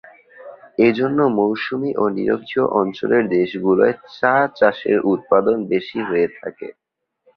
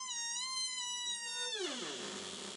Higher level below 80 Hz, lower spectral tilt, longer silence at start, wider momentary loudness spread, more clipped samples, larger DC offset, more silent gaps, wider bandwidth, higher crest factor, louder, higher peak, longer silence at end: first, -60 dBFS vs under -90 dBFS; first, -8.5 dB/octave vs 0 dB/octave; first, 0.4 s vs 0 s; about the same, 6 LU vs 5 LU; neither; neither; neither; second, 6 kHz vs 11.5 kHz; about the same, 18 dB vs 14 dB; first, -18 LUFS vs -38 LUFS; first, -2 dBFS vs -26 dBFS; first, 0.65 s vs 0 s